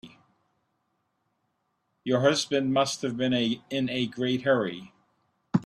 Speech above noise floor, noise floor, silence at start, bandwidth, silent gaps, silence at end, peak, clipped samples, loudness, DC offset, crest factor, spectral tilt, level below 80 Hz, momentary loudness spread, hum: 50 dB; -76 dBFS; 0.05 s; 12.5 kHz; none; 0 s; -8 dBFS; under 0.1%; -27 LUFS; under 0.1%; 20 dB; -5 dB/octave; -68 dBFS; 7 LU; none